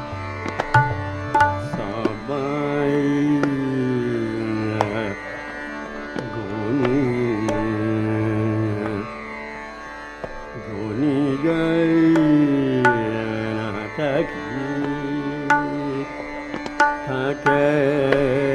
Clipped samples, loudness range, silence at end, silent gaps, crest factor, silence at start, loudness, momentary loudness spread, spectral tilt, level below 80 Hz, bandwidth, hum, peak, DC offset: under 0.1%; 6 LU; 0 s; none; 20 dB; 0 s; -22 LUFS; 13 LU; -7 dB/octave; -46 dBFS; 10.5 kHz; none; 0 dBFS; under 0.1%